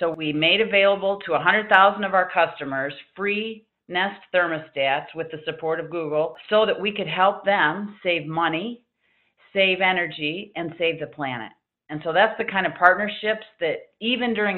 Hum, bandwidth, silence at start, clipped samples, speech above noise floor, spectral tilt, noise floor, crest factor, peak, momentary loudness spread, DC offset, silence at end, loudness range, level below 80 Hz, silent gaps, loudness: none; 4.5 kHz; 0 s; under 0.1%; 45 dB; -7 dB/octave; -68 dBFS; 22 dB; 0 dBFS; 12 LU; under 0.1%; 0 s; 5 LU; -66 dBFS; none; -22 LUFS